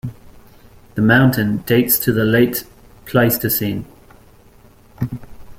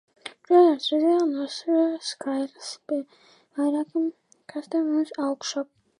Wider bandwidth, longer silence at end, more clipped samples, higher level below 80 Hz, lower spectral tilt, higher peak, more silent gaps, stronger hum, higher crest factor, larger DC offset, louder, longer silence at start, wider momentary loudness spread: first, 16.5 kHz vs 10.5 kHz; second, 0.05 s vs 0.35 s; neither; first, -44 dBFS vs -84 dBFS; first, -5.5 dB/octave vs -3 dB/octave; first, 0 dBFS vs -8 dBFS; neither; neither; about the same, 18 dB vs 18 dB; neither; first, -16 LUFS vs -25 LUFS; second, 0.05 s vs 0.25 s; second, 15 LU vs 18 LU